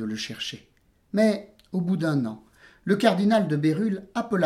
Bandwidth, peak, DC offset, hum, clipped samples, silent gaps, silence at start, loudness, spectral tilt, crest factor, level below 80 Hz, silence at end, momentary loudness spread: 13 kHz; -6 dBFS; under 0.1%; none; under 0.1%; none; 0 s; -25 LUFS; -6.5 dB/octave; 20 dB; -64 dBFS; 0 s; 12 LU